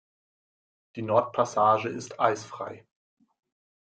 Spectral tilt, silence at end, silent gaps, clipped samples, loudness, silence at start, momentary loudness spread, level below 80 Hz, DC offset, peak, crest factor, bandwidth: -5 dB/octave; 1.15 s; none; under 0.1%; -26 LUFS; 0.95 s; 16 LU; -74 dBFS; under 0.1%; -8 dBFS; 22 dB; 9.2 kHz